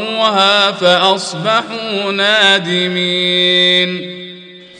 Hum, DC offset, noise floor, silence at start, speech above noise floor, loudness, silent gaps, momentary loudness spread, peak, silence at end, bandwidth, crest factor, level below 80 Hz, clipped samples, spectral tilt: none; under 0.1%; -35 dBFS; 0 s; 22 dB; -11 LUFS; none; 10 LU; 0 dBFS; 0 s; 10.5 kHz; 14 dB; -64 dBFS; under 0.1%; -3.5 dB/octave